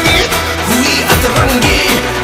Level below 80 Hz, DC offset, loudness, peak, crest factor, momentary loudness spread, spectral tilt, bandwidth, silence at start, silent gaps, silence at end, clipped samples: -24 dBFS; under 0.1%; -10 LUFS; 0 dBFS; 12 dB; 3 LU; -3.5 dB/octave; 18 kHz; 0 s; none; 0 s; 0.2%